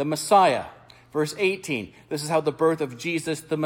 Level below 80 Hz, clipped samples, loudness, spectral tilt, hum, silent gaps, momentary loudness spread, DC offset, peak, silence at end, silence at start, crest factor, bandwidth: -64 dBFS; under 0.1%; -24 LUFS; -4.5 dB/octave; none; none; 13 LU; under 0.1%; -6 dBFS; 0 s; 0 s; 18 dB; 17.5 kHz